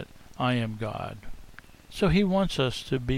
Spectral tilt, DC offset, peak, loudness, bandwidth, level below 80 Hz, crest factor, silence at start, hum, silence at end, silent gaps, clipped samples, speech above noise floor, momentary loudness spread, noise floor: -6.5 dB/octave; under 0.1%; -10 dBFS; -27 LUFS; 15.5 kHz; -42 dBFS; 18 dB; 0 s; none; 0 s; none; under 0.1%; 22 dB; 20 LU; -48 dBFS